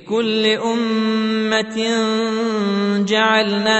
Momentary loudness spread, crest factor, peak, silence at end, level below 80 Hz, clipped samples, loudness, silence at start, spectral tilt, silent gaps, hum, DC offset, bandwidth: 4 LU; 16 dB; -2 dBFS; 0 s; -62 dBFS; under 0.1%; -18 LUFS; 0.05 s; -4.5 dB/octave; none; none; under 0.1%; 8.4 kHz